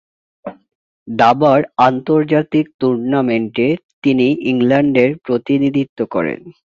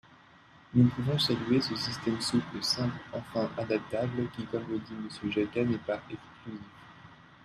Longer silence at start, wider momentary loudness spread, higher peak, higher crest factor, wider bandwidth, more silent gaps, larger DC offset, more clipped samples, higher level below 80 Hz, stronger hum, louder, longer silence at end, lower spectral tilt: second, 0.45 s vs 0.7 s; second, 8 LU vs 18 LU; first, 0 dBFS vs -12 dBFS; second, 14 dB vs 20 dB; second, 7 kHz vs 14 kHz; first, 0.75-1.06 s, 2.74-2.79 s, 3.84-4.02 s, 5.89-5.96 s vs none; neither; neither; first, -56 dBFS vs -62 dBFS; neither; first, -15 LUFS vs -31 LUFS; second, 0.15 s vs 0.3 s; first, -8 dB/octave vs -5.5 dB/octave